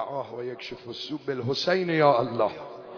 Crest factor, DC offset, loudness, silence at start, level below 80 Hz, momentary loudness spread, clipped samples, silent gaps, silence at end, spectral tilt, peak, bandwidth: 20 dB; under 0.1%; -26 LUFS; 0 s; -66 dBFS; 15 LU; under 0.1%; none; 0 s; -6 dB/octave; -8 dBFS; 5.4 kHz